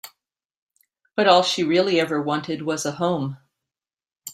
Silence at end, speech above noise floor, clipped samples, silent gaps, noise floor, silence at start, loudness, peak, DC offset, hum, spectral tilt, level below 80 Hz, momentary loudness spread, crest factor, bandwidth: 0 s; 68 dB; under 0.1%; 0.45-0.49 s, 0.58-0.67 s; -89 dBFS; 0.05 s; -21 LUFS; -2 dBFS; under 0.1%; none; -4.5 dB/octave; -66 dBFS; 12 LU; 22 dB; 16 kHz